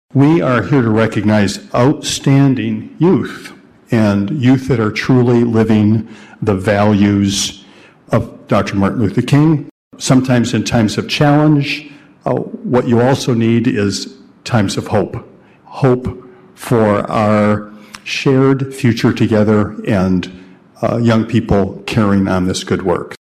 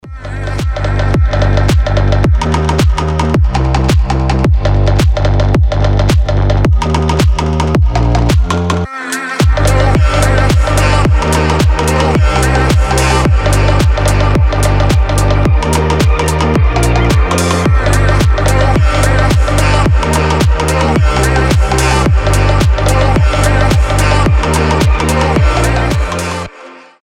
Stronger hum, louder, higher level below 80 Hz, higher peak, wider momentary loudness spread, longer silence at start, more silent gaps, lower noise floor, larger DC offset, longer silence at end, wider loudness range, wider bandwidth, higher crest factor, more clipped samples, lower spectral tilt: neither; second, -14 LUFS vs -11 LUFS; second, -42 dBFS vs -14 dBFS; about the same, 0 dBFS vs 0 dBFS; first, 9 LU vs 3 LU; about the same, 0.15 s vs 0.05 s; first, 9.71-9.91 s vs none; first, -42 dBFS vs -34 dBFS; neither; second, 0.1 s vs 0.25 s; about the same, 3 LU vs 1 LU; second, 14 kHz vs 15.5 kHz; about the same, 12 dB vs 10 dB; neither; about the same, -6.5 dB/octave vs -5.5 dB/octave